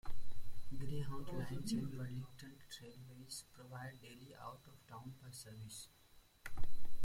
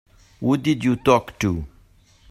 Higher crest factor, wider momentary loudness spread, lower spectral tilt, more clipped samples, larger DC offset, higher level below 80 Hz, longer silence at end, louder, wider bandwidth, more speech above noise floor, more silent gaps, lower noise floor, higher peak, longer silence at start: second, 14 dB vs 20 dB; first, 14 LU vs 10 LU; second, -5 dB/octave vs -6.5 dB/octave; neither; neither; second, -54 dBFS vs -46 dBFS; second, 0 s vs 0.65 s; second, -50 LUFS vs -21 LUFS; about the same, 15.5 kHz vs 15.5 kHz; second, 9 dB vs 34 dB; neither; about the same, -55 dBFS vs -54 dBFS; second, -22 dBFS vs -2 dBFS; second, 0.05 s vs 0.4 s